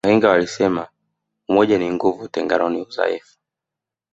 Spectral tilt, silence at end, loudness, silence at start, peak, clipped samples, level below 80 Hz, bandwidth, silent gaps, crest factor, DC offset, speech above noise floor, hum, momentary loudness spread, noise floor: -5.5 dB/octave; 0.95 s; -19 LUFS; 0.05 s; -2 dBFS; under 0.1%; -56 dBFS; 8 kHz; none; 18 dB; under 0.1%; 68 dB; none; 12 LU; -86 dBFS